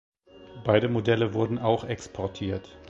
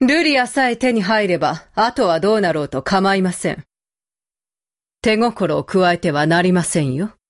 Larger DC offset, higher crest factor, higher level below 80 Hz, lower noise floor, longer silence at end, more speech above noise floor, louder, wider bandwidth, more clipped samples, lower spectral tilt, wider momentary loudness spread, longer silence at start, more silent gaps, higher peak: neither; first, 20 dB vs 12 dB; about the same, -52 dBFS vs -50 dBFS; second, -47 dBFS vs under -90 dBFS; second, 0 s vs 0.2 s; second, 21 dB vs over 73 dB; second, -27 LUFS vs -17 LUFS; second, 8 kHz vs 11.5 kHz; neither; first, -7 dB/octave vs -5 dB/octave; first, 11 LU vs 6 LU; first, 0.35 s vs 0 s; neither; about the same, -6 dBFS vs -4 dBFS